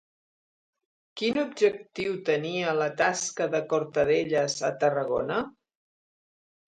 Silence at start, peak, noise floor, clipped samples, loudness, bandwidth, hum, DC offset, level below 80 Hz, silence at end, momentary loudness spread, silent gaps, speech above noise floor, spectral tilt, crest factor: 1.15 s; -10 dBFS; under -90 dBFS; under 0.1%; -27 LUFS; 9.4 kHz; none; under 0.1%; -66 dBFS; 1.15 s; 7 LU; none; over 63 dB; -4 dB/octave; 18 dB